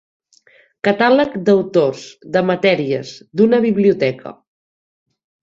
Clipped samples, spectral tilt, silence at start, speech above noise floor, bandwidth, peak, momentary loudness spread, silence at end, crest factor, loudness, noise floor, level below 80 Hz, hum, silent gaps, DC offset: under 0.1%; -6.5 dB/octave; 0.85 s; 37 dB; 7.6 kHz; -2 dBFS; 11 LU; 1.1 s; 16 dB; -16 LUFS; -52 dBFS; -60 dBFS; none; none; under 0.1%